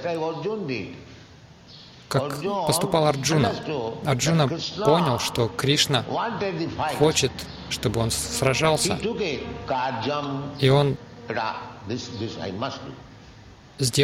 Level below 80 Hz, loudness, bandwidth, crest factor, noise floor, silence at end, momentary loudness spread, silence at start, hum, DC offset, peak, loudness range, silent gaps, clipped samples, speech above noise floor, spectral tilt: -50 dBFS; -24 LUFS; 16.5 kHz; 20 dB; -48 dBFS; 0 s; 12 LU; 0 s; none; under 0.1%; -4 dBFS; 4 LU; none; under 0.1%; 24 dB; -4.5 dB/octave